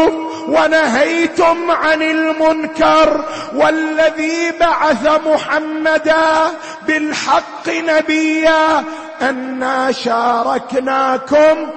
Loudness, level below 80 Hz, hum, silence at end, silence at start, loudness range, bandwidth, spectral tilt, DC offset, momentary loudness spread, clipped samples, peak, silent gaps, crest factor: -14 LUFS; -48 dBFS; none; 0 s; 0 s; 2 LU; 8.8 kHz; -3.5 dB/octave; under 0.1%; 7 LU; under 0.1%; -2 dBFS; none; 12 dB